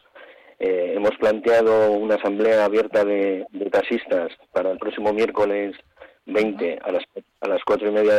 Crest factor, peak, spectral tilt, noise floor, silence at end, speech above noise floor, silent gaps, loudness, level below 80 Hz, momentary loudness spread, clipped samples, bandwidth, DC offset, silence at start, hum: 10 dB; -12 dBFS; -6 dB/octave; -47 dBFS; 0 s; 27 dB; none; -21 LUFS; -60 dBFS; 9 LU; under 0.1%; 10.5 kHz; under 0.1%; 0.15 s; none